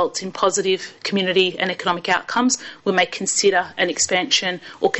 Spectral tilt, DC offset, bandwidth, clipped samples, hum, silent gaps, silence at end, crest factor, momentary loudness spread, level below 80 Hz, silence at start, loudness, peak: -2 dB/octave; under 0.1%; 8.4 kHz; under 0.1%; none; none; 0 s; 16 dB; 6 LU; -62 dBFS; 0 s; -19 LUFS; -6 dBFS